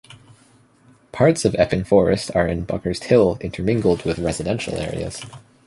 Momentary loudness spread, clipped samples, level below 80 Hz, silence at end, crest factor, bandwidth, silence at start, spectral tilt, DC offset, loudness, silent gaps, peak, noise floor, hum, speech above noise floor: 11 LU; under 0.1%; -40 dBFS; 0.3 s; 18 dB; 11.5 kHz; 0.1 s; -6 dB/octave; under 0.1%; -20 LUFS; none; -2 dBFS; -54 dBFS; none; 35 dB